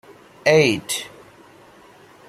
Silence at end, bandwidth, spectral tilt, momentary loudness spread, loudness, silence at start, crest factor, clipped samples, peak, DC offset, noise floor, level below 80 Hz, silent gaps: 1.2 s; 16 kHz; -4 dB/octave; 13 LU; -19 LUFS; 0.45 s; 22 dB; under 0.1%; 0 dBFS; under 0.1%; -48 dBFS; -62 dBFS; none